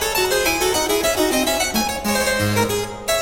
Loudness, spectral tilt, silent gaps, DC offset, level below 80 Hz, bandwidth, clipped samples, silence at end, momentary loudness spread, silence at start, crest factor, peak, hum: -18 LUFS; -3 dB/octave; none; 0.4%; -40 dBFS; 16.5 kHz; under 0.1%; 0 s; 3 LU; 0 s; 14 dB; -6 dBFS; none